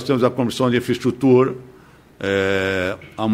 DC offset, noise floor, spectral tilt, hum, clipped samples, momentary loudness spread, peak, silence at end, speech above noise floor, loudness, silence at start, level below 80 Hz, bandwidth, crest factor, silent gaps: under 0.1%; -47 dBFS; -6.5 dB/octave; none; under 0.1%; 10 LU; -2 dBFS; 0 s; 29 dB; -19 LUFS; 0 s; -54 dBFS; 15.5 kHz; 16 dB; none